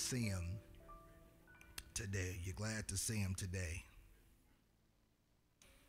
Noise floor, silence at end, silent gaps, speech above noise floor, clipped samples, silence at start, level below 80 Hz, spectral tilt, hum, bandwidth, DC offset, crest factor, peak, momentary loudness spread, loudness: -77 dBFS; 0.1 s; none; 34 dB; under 0.1%; 0 s; -60 dBFS; -4 dB/octave; none; 16 kHz; under 0.1%; 18 dB; -28 dBFS; 21 LU; -44 LUFS